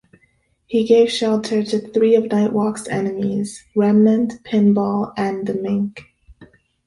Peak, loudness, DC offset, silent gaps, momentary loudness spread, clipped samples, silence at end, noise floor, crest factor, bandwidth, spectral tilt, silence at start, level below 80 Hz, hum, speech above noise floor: -2 dBFS; -18 LUFS; under 0.1%; none; 9 LU; under 0.1%; 0.4 s; -61 dBFS; 16 dB; 11.5 kHz; -6.5 dB/octave; 0.7 s; -56 dBFS; none; 44 dB